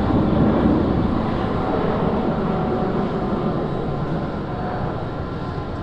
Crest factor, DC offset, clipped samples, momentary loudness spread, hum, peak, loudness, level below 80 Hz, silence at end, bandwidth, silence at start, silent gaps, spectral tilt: 16 dB; under 0.1%; under 0.1%; 9 LU; none; -6 dBFS; -22 LUFS; -34 dBFS; 0 s; 8 kHz; 0 s; none; -9.5 dB/octave